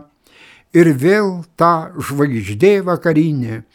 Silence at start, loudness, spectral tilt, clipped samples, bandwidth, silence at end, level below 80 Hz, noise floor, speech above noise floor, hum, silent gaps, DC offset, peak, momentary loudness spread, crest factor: 0.75 s; -15 LUFS; -7.5 dB/octave; under 0.1%; 16.5 kHz; 0.15 s; -56 dBFS; -47 dBFS; 32 dB; none; none; under 0.1%; 0 dBFS; 7 LU; 16 dB